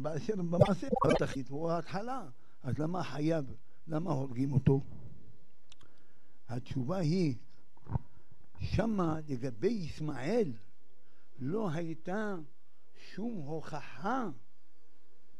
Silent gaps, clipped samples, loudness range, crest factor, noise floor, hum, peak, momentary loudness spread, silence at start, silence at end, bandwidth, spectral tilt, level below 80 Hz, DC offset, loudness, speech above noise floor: none; under 0.1%; 6 LU; 28 dB; -74 dBFS; none; -8 dBFS; 15 LU; 0 s; 1 s; 11.5 kHz; -7.5 dB/octave; -54 dBFS; 1%; -35 LUFS; 40 dB